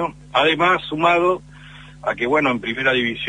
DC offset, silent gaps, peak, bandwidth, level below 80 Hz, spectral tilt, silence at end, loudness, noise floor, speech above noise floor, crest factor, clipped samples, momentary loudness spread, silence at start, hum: under 0.1%; none; -2 dBFS; 10 kHz; -50 dBFS; -5 dB/octave; 0 s; -18 LUFS; -41 dBFS; 22 dB; 18 dB; under 0.1%; 9 LU; 0 s; 50 Hz at -45 dBFS